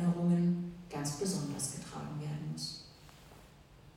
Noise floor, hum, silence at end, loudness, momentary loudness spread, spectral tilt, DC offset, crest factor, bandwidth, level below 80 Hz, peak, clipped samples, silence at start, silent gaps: -58 dBFS; none; 0.05 s; -36 LUFS; 25 LU; -5.5 dB/octave; under 0.1%; 14 dB; 15.5 kHz; -64 dBFS; -22 dBFS; under 0.1%; 0 s; none